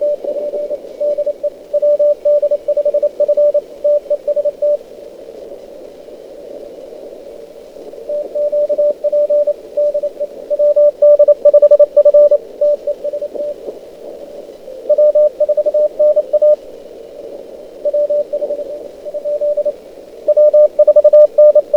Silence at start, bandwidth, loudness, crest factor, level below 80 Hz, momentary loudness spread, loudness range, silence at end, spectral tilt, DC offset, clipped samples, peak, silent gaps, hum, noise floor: 0 s; 4.9 kHz; -13 LUFS; 14 dB; -56 dBFS; 24 LU; 11 LU; 0 s; -5.5 dB/octave; under 0.1%; under 0.1%; 0 dBFS; none; none; -34 dBFS